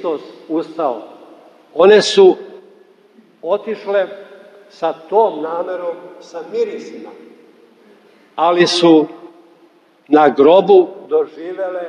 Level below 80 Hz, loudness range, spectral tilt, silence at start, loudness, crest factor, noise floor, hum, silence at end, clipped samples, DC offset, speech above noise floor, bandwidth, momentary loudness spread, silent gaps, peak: -70 dBFS; 8 LU; -4.5 dB/octave; 0 s; -14 LUFS; 16 dB; -50 dBFS; none; 0 s; under 0.1%; under 0.1%; 36 dB; 10 kHz; 20 LU; none; 0 dBFS